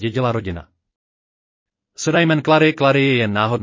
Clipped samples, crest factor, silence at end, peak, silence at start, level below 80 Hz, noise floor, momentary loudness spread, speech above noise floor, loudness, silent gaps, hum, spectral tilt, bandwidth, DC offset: under 0.1%; 16 dB; 0 s; -2 dBFS; 0 s; -46 dBFS; under -90 dBFS; 11 LU; over 73 dB; -16 LUFS; 0.96-1.66 s; none; -5.5 dB/octave; 7.6 kHz; under 0.1%